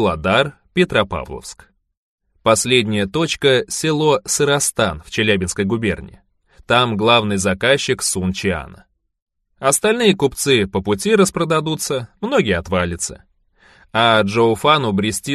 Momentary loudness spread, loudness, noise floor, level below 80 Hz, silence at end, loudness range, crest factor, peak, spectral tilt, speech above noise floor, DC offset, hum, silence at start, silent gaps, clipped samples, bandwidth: 8 LU; -17 LUFS; -53 dBFS; -44 dBFS; 0 s; 2 LU; 18 dB; 0 dBFS; -4 dB/octave; 36 dB; under 0.1%; none; 0 s; 1.97-2.18 s, 9.22-9.26 s; under 0.1%; 13 kHz